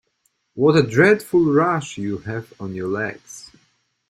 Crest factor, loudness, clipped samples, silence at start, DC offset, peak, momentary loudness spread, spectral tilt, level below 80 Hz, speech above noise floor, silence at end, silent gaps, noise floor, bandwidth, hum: 18 dB; -19 LUFS; under 0.1%; 0.55 s; under 0.1%; -2 dBFS; 22 LU; -6.5 dB/octave; -56 dBFS; 49 dB; 0.7 s; none; -68 dBFS; 15.5 kHz; none